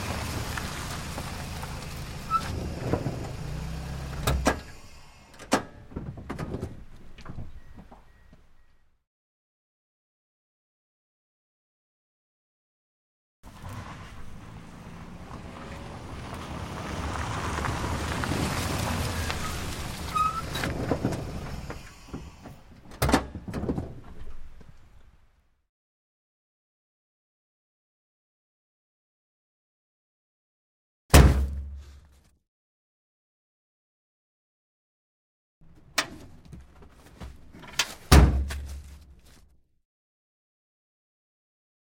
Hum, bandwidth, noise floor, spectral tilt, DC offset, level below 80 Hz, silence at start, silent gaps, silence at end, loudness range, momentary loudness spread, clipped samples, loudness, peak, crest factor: none; 16.5 kHz; -62 dBFS; -5 dB/octave; under 0.1%; -36 dBFS; 0 s; 9.07-13.43 s, 25.69-31.09 s, 32.48-35.61 s; 2.6 s; 18 LU; 21 LU; under 0.1%; -29 LUFS; -2 dBFS; 30 dB